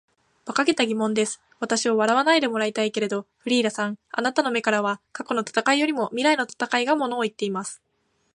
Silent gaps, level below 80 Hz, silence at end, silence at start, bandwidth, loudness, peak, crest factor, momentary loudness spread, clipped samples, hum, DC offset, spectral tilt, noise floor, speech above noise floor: none; -76 dBFS; 0.6 s; 0.45 s; 11.5 kHz; -23 LUFS; -4 dBFS; 20 dB; 8 LU; under 0.1%; none; under 0.1%; -3 dB/octave; -70 dBFS; 47 dB